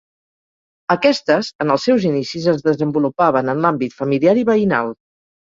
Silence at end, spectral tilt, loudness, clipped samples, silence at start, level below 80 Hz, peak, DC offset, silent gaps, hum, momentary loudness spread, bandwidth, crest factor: 0.55 s; -6.5 dB/octave; -17 LUFS; under 0.1%; 0.9 s; -58 dBFS; -2 dBFS; under 0.1%; 1.55-1.59 s; none; 6 LU; 7.8 kHz; 16 dB